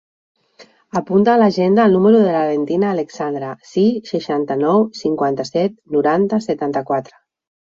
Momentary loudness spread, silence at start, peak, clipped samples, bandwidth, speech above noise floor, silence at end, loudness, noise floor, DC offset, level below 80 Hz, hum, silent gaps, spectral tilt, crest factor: 11 LU; 0.6 s; -2 dBFS; under 0.1%; 7.6 kHz; 32 dB; 0.65 s; -17 LUFS; -48 dBFS; under 0.1%; -62 dBFS; none; none; -7.5 dB/octave; 14 dB